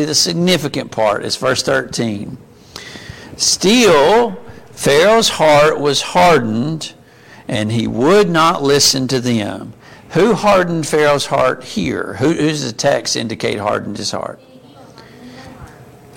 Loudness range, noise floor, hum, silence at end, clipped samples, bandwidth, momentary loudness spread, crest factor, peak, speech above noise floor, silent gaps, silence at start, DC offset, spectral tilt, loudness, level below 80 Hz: 6 LU; -41 dBFS; none; 0.35 s; under 0.1%; 17 kHz; 17 LU; 14 dB; 0 dBFS; 27 dB; none; 0 s; under 0.1%; -3.5 dB/octave; -14 LUFS; -46 dBFS